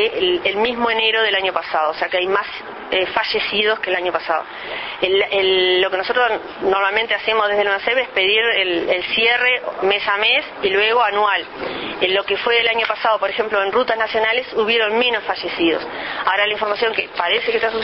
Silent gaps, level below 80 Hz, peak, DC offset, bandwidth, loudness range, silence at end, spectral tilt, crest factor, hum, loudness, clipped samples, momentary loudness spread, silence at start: none; -54 dBFS; -2 dBFS; under 0.1%; 6 kHz; 2 LU; 0 s; -5 dB/octave; 16 dB; none; -17 LUFS; under 0.1%; 7 LU; 0 s